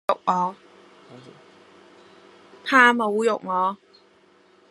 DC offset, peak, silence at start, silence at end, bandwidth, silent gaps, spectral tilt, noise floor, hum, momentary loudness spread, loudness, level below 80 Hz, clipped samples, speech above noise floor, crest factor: under 0.1%; -2 dBFS; 0.1 s; 0.95 s; 13 kHz; none; -4 dB/octave; -57 dBFS; none; 14 LU; -20 LUFS; -78 dBFS; under 0.1%; 36 dB; 24 dB